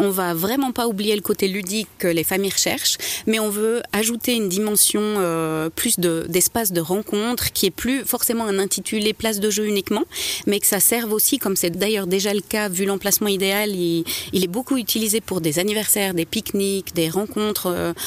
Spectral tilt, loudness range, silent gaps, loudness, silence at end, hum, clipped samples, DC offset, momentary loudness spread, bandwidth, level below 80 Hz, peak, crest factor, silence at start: -3 dB/octave; 2 LU; none; -20 LUFS; 0 s; none; under 0.1%; under 0.1%; 5 LU; 16 kHz; -52 dBFS; -4 dBFS; 18 dB; 0 s